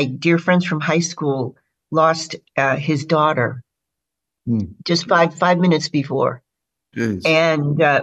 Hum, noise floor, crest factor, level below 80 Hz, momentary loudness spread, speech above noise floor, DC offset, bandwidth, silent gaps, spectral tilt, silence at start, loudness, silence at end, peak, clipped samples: none; -82 dBFS; 16 dB; -60 dBFS; 9 LU; 65 dB; under 0.1%; 8.4 kHz; none; -5.5 dB/octave; 0 s; -18 LUFS; 0 s; -4 dBFS; under 0.1%